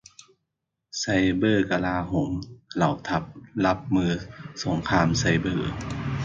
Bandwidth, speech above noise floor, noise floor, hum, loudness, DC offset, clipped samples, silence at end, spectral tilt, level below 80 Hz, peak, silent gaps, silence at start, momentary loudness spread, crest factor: 7.8 kHz; 57 dB; -82 dBFS; none; -25 LUFS; under 0.1%; under 0.1%; 0 s; -5.5 dB/octave; -44 dBFS; -8 dBFS; none; 0.95 s; 11 LU; 18 dB